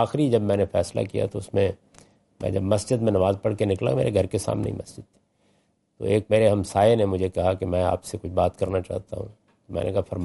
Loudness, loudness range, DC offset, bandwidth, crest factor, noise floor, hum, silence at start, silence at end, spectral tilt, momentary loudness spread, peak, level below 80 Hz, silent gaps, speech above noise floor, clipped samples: -24 LUFS; 3 LU; under 0.1%; 11.5 kHz; 18 dB; -67 dBFS; none; 0 s; 0 s; -7 dB/octave; 13 LU; -6 dBFS; -52 dBFS; none; 43 dB; under 0.1%